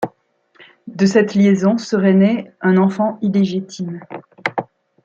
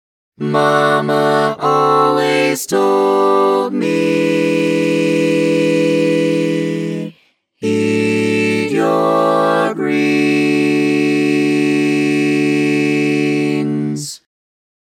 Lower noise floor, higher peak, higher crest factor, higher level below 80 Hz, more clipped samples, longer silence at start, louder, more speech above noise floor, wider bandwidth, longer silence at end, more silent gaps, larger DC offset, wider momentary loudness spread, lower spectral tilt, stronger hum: first, -58 dBFS vs -54 dBFS; about the same, -2 dBFS vs 0 dBFS; about the same, 14 dB vs 14 dB; first, -62 dBFS vs -68 dBFS; neither; second, 0 s vs 0.4 s; about the same, -16 LUFS vs -14 LUFS; about the same, 43 dB vs 41 dB; second, 7.4 kHz vs 16 kHz; second, 0.4 s vs 0.75 s; neither; neither; first, 14 LU vs 6 LU; first, -7 dB/octave vs -5.5 dB/octave; neither